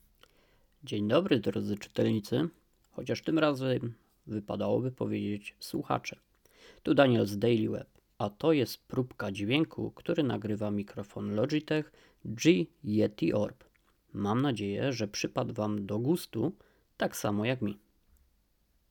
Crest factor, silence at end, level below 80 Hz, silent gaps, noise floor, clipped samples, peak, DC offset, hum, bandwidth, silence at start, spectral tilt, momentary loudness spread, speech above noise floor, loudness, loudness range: 22 dB; 1.15 s; -66 dBFS; none; -71 dBFS; under 0.1%; -10 dBFS; under 0.1%; none; 19 kHz; 0.85 s; -6 dB/octave; 12 LU; 41 dB; -31 LUFS; 3 LU